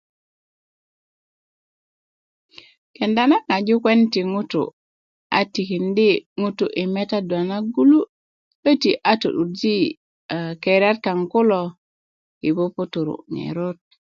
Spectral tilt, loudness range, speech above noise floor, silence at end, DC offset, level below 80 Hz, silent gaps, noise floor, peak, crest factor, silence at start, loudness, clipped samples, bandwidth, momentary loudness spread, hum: -6.5 dB/octave; 3 LU; over 71 dB; 0.35 s; under 0.1%; -68 dBFS; 4.73-5.30 s, 6.26-6.36 s, 8.09-8.63 s, 9.97-10.29 s, 11.78-12.41 s; under -90 dBFS; -2 dBFS; 18 dB; 3 s; -20 LUFS; under 0.1%; 7.2 kHz; 11 LU; none